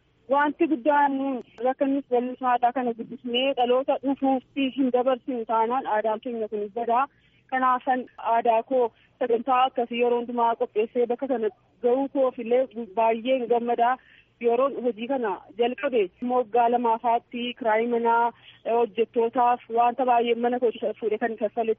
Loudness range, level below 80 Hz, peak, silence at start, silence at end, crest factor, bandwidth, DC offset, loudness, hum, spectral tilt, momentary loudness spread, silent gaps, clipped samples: 2 LU; -72 dBFS; -10 dBFS; 0.3 s; 0.05 s; 14 dB; 3.8 kHz; under 0.1%; -25 LUFS; none; -2 dB/octave; 7 LU; none; under 0.1%